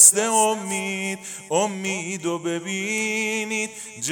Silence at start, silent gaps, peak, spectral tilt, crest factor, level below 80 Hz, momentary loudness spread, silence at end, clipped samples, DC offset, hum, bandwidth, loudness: 0 s; none; 0 dBFS; -2 dB/octave; 22 dB; -74 dBFS; 9 LU; 0 s; under 0.1%; under 0.1%; none; 19.5 kHz; -23 LUFS